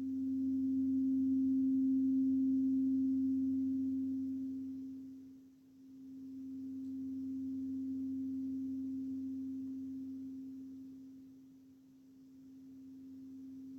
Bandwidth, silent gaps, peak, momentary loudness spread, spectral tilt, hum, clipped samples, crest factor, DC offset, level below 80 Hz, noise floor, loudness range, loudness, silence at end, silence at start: 0.8 kHz; none; -28 dBFS; 21 LU; -9 dB/octave; none; under 0.1%; 10 dB; under 0.1%; -84 dBFS; -61 dBFS; 16 LU; -37 LUFS; 0 s; 0 s